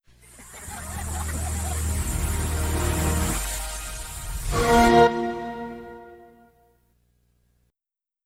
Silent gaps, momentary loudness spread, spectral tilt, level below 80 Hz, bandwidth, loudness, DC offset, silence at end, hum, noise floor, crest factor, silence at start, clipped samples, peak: none; 19 LU; -4.5 dB/octave; -34 dBFS; 16.5 kHz; -24 LUFS; under 0.1%; 2 s; 60 Hz at -55 dBFS; -87 dBFS; 20 dB; 0.35 s; under 0.1%; -6 dBFS